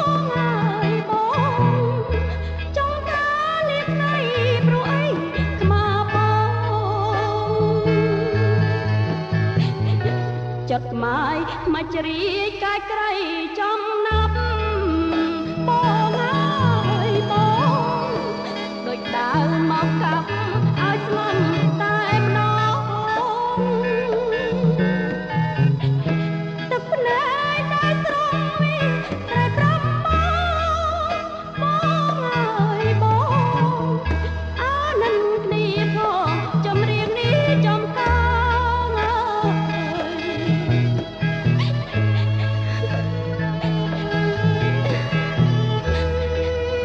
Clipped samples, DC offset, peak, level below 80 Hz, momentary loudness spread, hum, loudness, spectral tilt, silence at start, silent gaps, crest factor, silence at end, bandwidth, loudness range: under 0.1%; under 0.1%; -6 dBFS; -36 dBFS; 5 LU; none; -21 LUFS; -7.5 dB/octave; 0 s; none; 14 dB; 0 s; 7.2 kHz; 2 LU